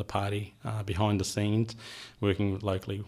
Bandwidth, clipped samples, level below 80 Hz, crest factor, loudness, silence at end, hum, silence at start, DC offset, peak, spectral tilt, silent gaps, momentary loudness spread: 13.5 kHz; under 0.1%; -54 dBFS; 18 dB; -31 LUFS; 0 s; none; 0 s; under 0.1%; -14 dBFS; -6 dB/octave; none; 8 LU